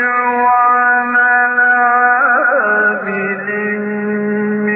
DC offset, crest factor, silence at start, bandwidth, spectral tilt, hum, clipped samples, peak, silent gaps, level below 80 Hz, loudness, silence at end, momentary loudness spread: under 0.1%; 12 dB; 0 s; 3.7 kHz; -12 dB/octave; none; under 0.1%; -2 dBFS; none; -62 dBFS; -12 LUFS; 0 s; 8 LU